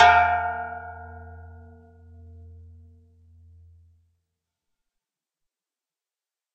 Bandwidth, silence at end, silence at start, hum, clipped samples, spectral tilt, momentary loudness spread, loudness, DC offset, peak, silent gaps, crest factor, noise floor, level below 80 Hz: 7.4 kHz; 5.1 s; 0 s; none; under 0.1%; -3.5 dB/octave; 29 LU; -22 LUFS; under 0.1%; -2 dBFS; none; 26 dB; under -90 dBFS; -52 dBFS